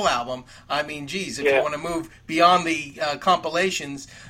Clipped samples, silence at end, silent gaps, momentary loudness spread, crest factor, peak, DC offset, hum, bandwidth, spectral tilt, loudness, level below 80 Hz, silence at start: under 0.1%; 0 s; none; 13 LU; 20 dB; -4 dBFS; under 0.1%; none; 16 kHz; -3.5 dB/octave; -23 LUFS; -54 dBFS; 0 s